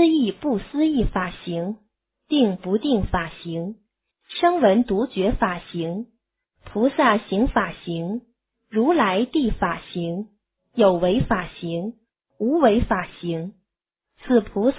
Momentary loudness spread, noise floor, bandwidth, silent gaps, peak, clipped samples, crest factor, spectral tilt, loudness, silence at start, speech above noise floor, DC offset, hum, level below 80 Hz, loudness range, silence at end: 13 LU; -83 dBFS; 4 kHz; none; -4 dBFS; under 0.1%; 18 dB; -10.5 dB/octave; -22 LUFS; 0 s; 62 dB; under 0.1%; none; -40 dBFS; 2 LU; 0 s